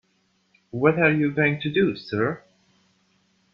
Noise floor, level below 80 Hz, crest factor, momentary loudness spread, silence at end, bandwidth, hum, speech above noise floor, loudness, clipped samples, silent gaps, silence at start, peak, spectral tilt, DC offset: -67 dBFS; -62 dBFS; 20 dB; 9 LU; 1.15 s; 6.4 kHz; none; 46 dB; -22 LUFS; under 0.1%; none; 0.75 s; -4 dBFS; -8.5 dB/octave; under 0.1%